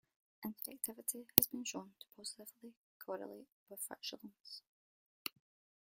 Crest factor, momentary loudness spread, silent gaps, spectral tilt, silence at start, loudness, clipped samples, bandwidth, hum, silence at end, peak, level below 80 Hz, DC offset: 44 dB; 25 LU; 2.77-3.00 s, 3.52-3.66 s, 4.40-4.44 s, 4.67-5.25 s; -2 dB/octave; 0.4 s; -39 LUFS; under 0.1%; 16.5 kHz; none; 0.55 s; 0 dBFS; -84 dBFS; under 0.1%